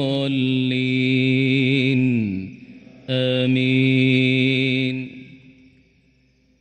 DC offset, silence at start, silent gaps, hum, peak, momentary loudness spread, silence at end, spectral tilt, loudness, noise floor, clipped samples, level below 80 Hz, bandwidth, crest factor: under 0.1%; 0 s; none; none; -4 dBFS; 11 LU; 1.25 s; -7.5 dB/octave; -19 LUFS; -60 dBFS; under 0.1%; -62 dBFS; 8.6 kHz; 16 dB